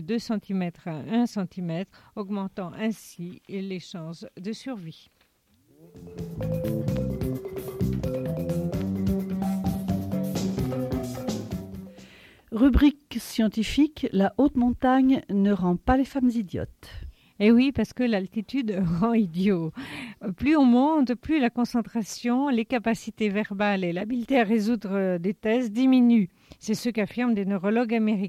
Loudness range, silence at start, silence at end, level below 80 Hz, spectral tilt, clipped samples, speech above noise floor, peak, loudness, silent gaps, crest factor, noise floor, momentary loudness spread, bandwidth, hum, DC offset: 10 LU; 0 s; 0 s; -42 dBFS; -7 dB/octave; under 0.1%; 40 dB; -8 dBFS; -25 LUFS; none; 18 dB; -65 dBFS; 15 LU; 15.5 kHz; none; under 0.1%